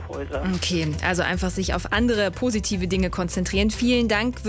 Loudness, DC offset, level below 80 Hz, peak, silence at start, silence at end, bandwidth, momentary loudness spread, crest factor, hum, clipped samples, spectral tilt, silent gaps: -23 LUFS; under 0.1%; -34 dBFS; -8 dBFS; 0 s; 0 s; 8 kHz; 5 LU; 14 dB; none; under 0.1%; -4.5 dB/octave; none